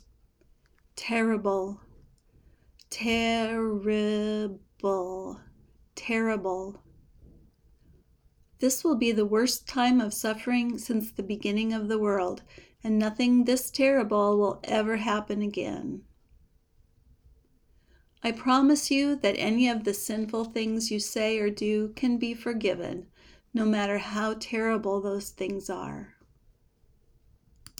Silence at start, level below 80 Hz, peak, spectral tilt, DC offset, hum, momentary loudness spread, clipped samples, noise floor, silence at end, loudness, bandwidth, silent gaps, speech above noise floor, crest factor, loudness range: 0.95 s; -58 dBFS; -10 dBFS; -4 dB/octave; under 0.1%; none; 13 LU; under 0.1%; -64 dBFS; 1.7 s; -28 LUFS; over 20 kHz; none; 37 dB; 18 dB; 7 LU